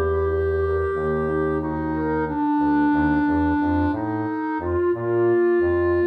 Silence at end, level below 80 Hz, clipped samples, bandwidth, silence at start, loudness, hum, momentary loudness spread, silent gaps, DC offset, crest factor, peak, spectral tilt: 0 s; -38 dBFS; under 0.1%; 5 kHz; 0 s; -22 LUFS; none; 6 LU; none; under 0.1%; 12 dB; -10 dBFS; -10 dB/octave